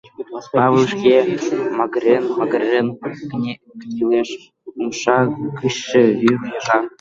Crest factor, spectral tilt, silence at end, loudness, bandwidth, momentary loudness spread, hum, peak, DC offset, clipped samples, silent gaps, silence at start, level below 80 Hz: 16 dB; -5.5 dB/octave; 0.1 s; -18 LUFS; 7.6 kHz; 14 LU; none; -2 dBFS; under 0.1%; under 0.1%; none; 0.2 s; -60 dBFS